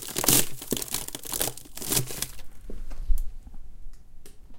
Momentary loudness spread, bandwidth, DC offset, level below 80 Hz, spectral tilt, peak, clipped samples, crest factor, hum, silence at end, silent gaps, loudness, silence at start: 23 LU; 17 kHz; under 0.1%; -34 dBFS; -2 dB/octave; -2 dBFS; under 0.1%; 26 dB; none; 0 s; none; -27 LUFS; 0 s